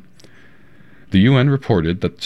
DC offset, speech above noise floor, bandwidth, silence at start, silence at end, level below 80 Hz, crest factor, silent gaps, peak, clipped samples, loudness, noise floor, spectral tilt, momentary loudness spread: under 0.1%; 34 dB; 6.2 kHz; 1.1 s; 0 s; -46 dBFS; 16 dB; none; -2 dBFS; under 0.1%; -16 LUFS; -49 dBFS; -8 dB/octave; 6 LU